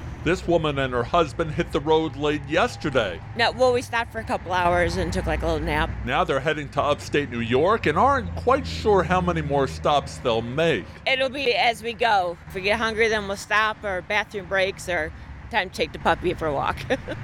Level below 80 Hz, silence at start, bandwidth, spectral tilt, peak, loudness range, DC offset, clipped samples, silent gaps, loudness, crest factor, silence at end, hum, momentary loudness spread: -38 dBFS; 0 s; 16 kHz; -5 dB/octave; -6 dBFS; 2 LU; under 0.1%; under 0.1%; none; -23 LUFS; 16 dB; 0 s; none; 6 LU